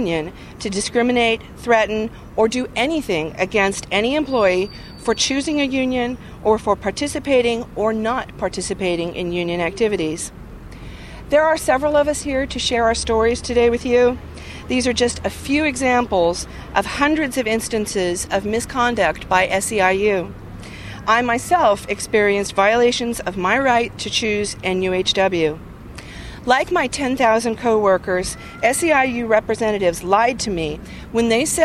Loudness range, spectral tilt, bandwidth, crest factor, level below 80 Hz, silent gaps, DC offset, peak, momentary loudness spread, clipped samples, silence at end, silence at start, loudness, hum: 3 LU; -3.5 dB/octave; 14 kHz; 18 dB; -40 dBFS; none; under 0.1%; 0 dBFS; 10 LU; under 0.1%; 0 s; 0 s; -19 LUFS; none